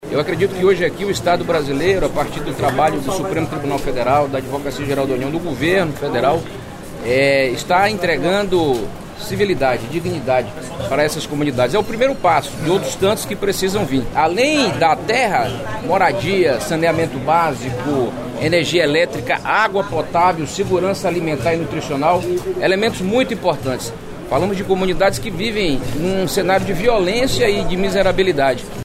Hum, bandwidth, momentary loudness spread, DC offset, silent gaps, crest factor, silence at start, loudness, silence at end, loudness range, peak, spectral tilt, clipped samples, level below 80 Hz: none; 16 kHz; 7 LU; under 0.1%; none; 14 dB; 0 s; -17 LUFS; 0 s; 2 LU; -2 dBFS; -5 dB/octave; under 0.1%; -36 dBFS